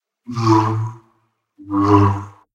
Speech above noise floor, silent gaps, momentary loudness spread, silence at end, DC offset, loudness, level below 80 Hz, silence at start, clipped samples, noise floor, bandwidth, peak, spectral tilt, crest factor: 49 dB; none; 14 LU; 0.25 s; under 0.1%; -17 LUFS; -50 dBFS; 0.3 s; under 0.1%; -64 dBFS; 7.8 kHz; 0 dBFS; -8 dB/octave; 18 dB